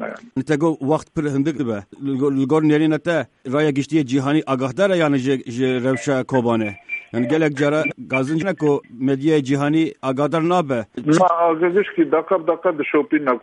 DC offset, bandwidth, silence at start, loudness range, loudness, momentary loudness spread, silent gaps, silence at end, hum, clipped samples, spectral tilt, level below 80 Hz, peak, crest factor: under 0.1%; 10.5 kHz; 0 s; 2 LU; -19 LUFS; 7 LU; none; 0.05 s; none; under 0.1%; -6.5 dB/octave; -60 dBFS; -4 dBFS; 16 dB